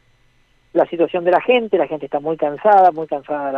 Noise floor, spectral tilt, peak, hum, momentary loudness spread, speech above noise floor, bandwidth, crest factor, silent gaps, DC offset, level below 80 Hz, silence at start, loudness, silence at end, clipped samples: -57 dBFS; -7.5 dB/octave; -2 dBFS; none; 11 LU; 40 dB; 5.4 kHz; 14 dB; none; under 0.1%; -60 dBFS; 0.75 s; -17 LUFS; 0 s; under 0.1%